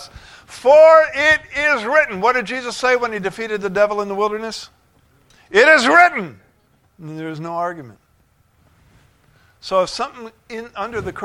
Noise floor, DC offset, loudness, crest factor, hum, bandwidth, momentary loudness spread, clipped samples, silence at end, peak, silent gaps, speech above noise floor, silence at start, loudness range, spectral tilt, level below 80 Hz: -58 dBFS; under 0.1%; -15 LUFS; 18 dB; none; 12 kHz; 21 LU; under 0.1%; 0 s; 0 dBFS; none; 42 dB; 0 s; 13 LU; -3.5 dB/octave; -52 dBFS